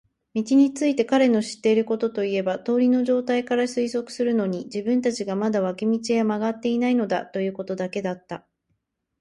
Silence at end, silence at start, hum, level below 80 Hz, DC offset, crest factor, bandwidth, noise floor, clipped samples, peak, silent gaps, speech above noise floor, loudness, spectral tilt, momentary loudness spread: 0.85 s; 0.35 s; none; -68 dBFS; under 0.1%; 14 dB; 11.5 kHz; -75 dBFS; under 0.1%; -8 dBFS; none; 52 dB; -23 LUFS; -5.5 dB/octave; 9 LU